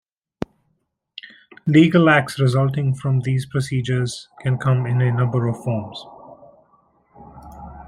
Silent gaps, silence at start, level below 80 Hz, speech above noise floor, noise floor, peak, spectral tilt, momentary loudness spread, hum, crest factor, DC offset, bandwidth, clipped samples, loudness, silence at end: none; 1.25 s; -52 dBFS; 52 dB; -70 dBFS; -2 dBFS; -7 dB/octave; 24 LU; none; 18 dB; under 0.1%; 12 kHz; under 0.1%; -19 LUFS; 0 s